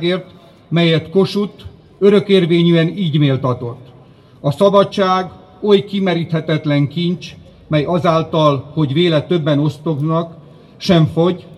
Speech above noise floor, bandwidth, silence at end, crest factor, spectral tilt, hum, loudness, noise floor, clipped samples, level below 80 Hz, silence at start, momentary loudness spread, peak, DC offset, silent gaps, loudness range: 29 dB; 11.5 kHz; 0.05 s; 16 dB; -7.5 dB/octave; none; -15 LUFS; -43 dBFS; under 0.1%; -52 dBFS; 0 s; 11 LU; 0 dBFS; under 0.1%; none; 2 LU